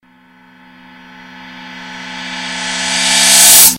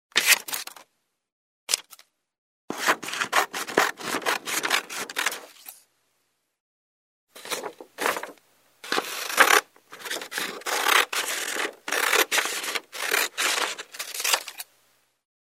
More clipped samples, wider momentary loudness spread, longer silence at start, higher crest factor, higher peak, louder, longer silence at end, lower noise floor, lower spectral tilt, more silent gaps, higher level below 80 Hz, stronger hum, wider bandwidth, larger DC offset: first, 1% vs under 0.1%; first, 26 LU vs 18 LU; first, 1.35 s vs 0.15 s; second, 14 dB vs 28 dB; about the same, 0 dBFS vs 0 dBFS; first, -8 LUFS vs -24 LUFS; second, 0 s vs 0.85 s; second, -46 dBFS vs -74 dBFS; about the same, 1 dB/octave vs 0.5 dB/octave; second, none vs 1.32-1.67 s, 2.38-2.68 s, 6.60-7.27 s; first, -50 dBFS vs -84 dBFS; neither; first, over 20 kHz vs 16 kHz; neither